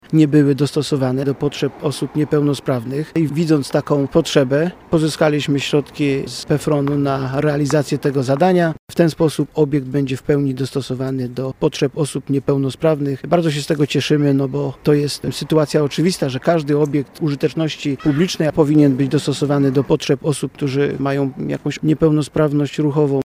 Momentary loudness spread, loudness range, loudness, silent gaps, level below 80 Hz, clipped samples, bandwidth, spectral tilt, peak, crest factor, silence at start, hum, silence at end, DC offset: 6 LU; 2 LU; -18 LUFS; 8.79-8.87 s; -48 dBFS; under 0.1%; 16 kHz; -6.5 dB/octave; 0 dBFS; 16 dB; 0.1 s; none; 0.1 s; under 0.1%